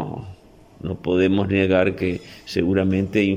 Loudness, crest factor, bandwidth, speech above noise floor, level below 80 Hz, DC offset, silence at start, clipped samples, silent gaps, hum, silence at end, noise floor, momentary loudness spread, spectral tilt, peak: -21 LUFS; 16 dB; 11 kHz; 26 dB; -50 dBFS; under 0.1%; 0 s; under 0.1%; none; none; 0 s; -46 dBFS; 14 LU; -7.5 dB/octave; -6 dBFS